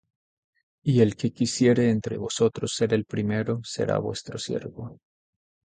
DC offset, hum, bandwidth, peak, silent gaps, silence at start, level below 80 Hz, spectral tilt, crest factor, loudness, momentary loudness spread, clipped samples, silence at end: under 0.1%; none; 9.4 kHz; -6 dBFS; none; 0.85 s; -58 dBFS; -6 dB/octave; 20 dB; -25 LUFS; 11 LU; under 0.1%; 0.7 s